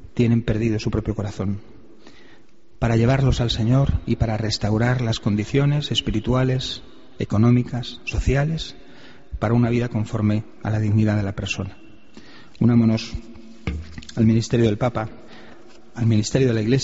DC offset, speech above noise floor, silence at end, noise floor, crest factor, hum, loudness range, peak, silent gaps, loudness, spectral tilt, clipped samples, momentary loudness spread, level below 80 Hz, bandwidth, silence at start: 1%; 34 dB; 0 s; -54 dBFS; 16 dB; none; 3 LU; -6 dBFS; none; -21 LUFS; -6.5 dB/octave; under 0.1%; 13 LU; -36 dBFS; 8 kHz; 0.15 s